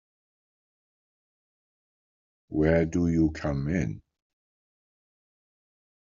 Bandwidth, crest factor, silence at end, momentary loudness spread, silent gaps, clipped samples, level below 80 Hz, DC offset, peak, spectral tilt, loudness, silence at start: 7.4 kHz; 22 dB; 2 s; 11 LU; none; under 0.1%; -48 dBFS; under 0.1%; -10 dBFS; -8.5 dB/octave; -27 LUFS; 2.5 s